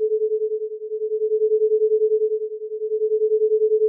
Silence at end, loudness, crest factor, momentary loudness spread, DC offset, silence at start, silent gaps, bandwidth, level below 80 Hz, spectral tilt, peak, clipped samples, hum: 0 s; -22 LUFS; 8 dB; 9 LU; under 0.1%; 0 s; none; 0.6 kHz; under -90 dBFS; 0.5 dB/octave; -12 dBFS; under 0.1%; none